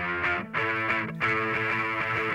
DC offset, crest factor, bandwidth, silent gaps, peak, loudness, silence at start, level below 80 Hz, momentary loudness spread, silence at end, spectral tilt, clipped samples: under 0.1%; 14 dB; 16 kHz; none; -14 dBFS; -26 LUFS; 0 s; -58 dBFS; 2 LU; 0 s; -6 dB/octave; under 0.1%